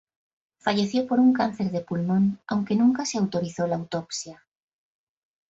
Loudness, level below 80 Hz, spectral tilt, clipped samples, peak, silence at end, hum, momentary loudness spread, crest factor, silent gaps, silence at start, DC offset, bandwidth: -25 LUFS; -66 dBFS; -6 dB/octave; under 0.1%; -10 dBFS; 1.15 s; none; 10 LU; 16 dB; none; 0.65 s; under 0.1%; 8 kHz